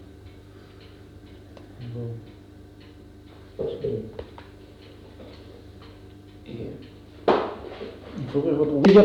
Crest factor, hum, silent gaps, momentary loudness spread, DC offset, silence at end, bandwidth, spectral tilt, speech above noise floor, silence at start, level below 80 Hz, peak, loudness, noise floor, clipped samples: 22 dB; 50 Hz at -55 dBFS; none; 24 LU; under 0.1%; 0 s; 7.6 kHz; -8 dB/octave; 26 dB; 0 s; -52 dBFS; -4 dBFS; -26 LUFS; -46 dBFS; under 0.1%